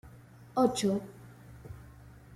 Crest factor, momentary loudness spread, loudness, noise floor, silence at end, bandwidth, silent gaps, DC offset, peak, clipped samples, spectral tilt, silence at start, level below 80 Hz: 20 dB; 25 LU; -30 LUFS; -53 dBFS; 0.25 s; 15.5 kHz; none; under 0.1%; -14 dBFS; under 0.1%; -5.5 dB/octave; 0.05 s; -60 dBFS